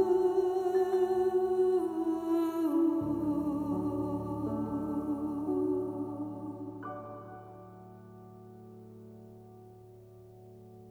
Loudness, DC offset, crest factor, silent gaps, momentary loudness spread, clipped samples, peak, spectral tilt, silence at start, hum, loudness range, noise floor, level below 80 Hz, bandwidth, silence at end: -32 LUFS; under 0.1%; 16 dB; none; 23 LU; under 0.1%; -16 dBFS; -8.5 dB/octave; 0 s; none; 21 LU; -53 dBFS; -60 dBFS; 14.5 kHz; 0 s